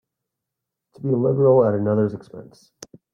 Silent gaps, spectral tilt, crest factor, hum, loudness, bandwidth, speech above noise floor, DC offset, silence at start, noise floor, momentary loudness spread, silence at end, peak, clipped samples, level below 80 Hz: none; -9 dB/octave; 16 dB; none; -19 LUFS; 9.2 kHz; 64 dB; under 0.1%; 1 s; -83 dBFS; 13 LU; 0.7 s; -6 dBFS; under 0.1%; -64 dBFS